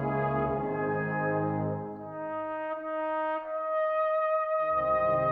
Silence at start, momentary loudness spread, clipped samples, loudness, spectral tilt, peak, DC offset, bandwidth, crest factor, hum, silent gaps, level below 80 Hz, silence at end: 0 s; 8 LU; under 0.1%; -30 LUFS; -10.5 dB/octave; -16 dBFS; under 0.1%; 4.4 kHz; 14 dB; none; none; -56 dBFS; 0 s